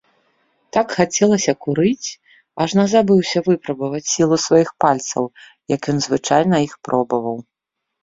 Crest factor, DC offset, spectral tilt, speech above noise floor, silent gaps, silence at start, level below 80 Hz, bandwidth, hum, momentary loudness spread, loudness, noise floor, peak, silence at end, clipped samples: 16 dB; under 0.1%; -5 dB/octave; 62 dB; none; 0.75 s; -58 dBFS; 7.8 kHz; none; 10 LU; -18 LUFS; -80 dBFS; -2 dBFS; 0.6 s; under 0.1%